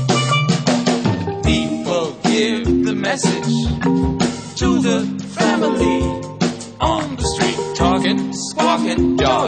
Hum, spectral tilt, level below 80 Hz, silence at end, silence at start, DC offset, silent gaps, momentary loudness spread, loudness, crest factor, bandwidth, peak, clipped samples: none; -5 dB/octave; -32 dBFS; 0 s; 0 s; under 0.1%; none; 5 LU; -18 LUFS; 16 dB; 9.4 kHz; 0 dBFS; under 0.1%